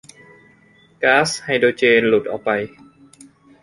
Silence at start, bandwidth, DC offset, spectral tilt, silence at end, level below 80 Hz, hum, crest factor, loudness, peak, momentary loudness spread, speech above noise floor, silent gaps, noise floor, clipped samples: 1 s; 11.5 kHz; under 0.1%; -4 dB/octave; 0.95 s; -60 dBFS; none; 18 dB; -17 LUFS; -2 dBFS; 8 LU; 36 dB; none; -53 dBFS; under 0.1%